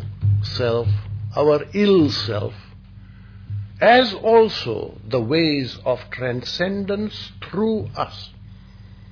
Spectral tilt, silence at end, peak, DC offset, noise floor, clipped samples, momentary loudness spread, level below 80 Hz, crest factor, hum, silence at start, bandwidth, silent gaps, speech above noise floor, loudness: -7 dB/octave; 0.05 s; -2 dBFS; under 0.1%; -42 dBFS; under 0.1%; 14 LU; -46 dBFS; 18 dB; none; 0 s; 5.4 kHz; none; 23 dB; -20 LUFS